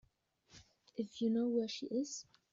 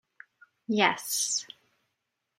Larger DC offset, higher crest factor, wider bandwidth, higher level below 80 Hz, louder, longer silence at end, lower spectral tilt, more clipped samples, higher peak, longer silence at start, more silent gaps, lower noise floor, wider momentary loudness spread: neither; second, 16 dB vs 26 dB; second, 7.6 kHz vs 16.5 kHz; first, -78 dBFS vs -84 dBFS; second, -39 LUFS vs -27 LUFS; second, 0.3 s vs 0.95 s; first, -5.5 dB/octave vs -1.5 dB/octave; neither; second, -24 dBFS vs -6 dBFS; second, 0.55 s vs 0.7 s; neither; second, -74 dBFS vs -82 dBFS; second, 12 LU vs 20 LU